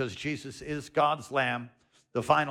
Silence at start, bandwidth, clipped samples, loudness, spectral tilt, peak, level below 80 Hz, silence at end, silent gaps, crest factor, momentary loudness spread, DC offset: 0 s; 15 kHz; under 0.1%; -30 LUFS; -5 dB/octave; -10 dBFS; -62 dBFS; 0 s; none; 20 dB; 11 LU; under 0.1%